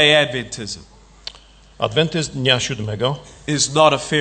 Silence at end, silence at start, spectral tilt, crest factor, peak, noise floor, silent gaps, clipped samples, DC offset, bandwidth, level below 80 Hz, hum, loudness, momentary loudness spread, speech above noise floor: 0 s; 0 s; -3.5 dB/octave; 20 dB; 0 dBFS; -46 dBFS; none; under 0.1%; under 0.1%; 9.2 kHz; -48 dBFS; none; -18 LUFS; 20 LU; 27 dB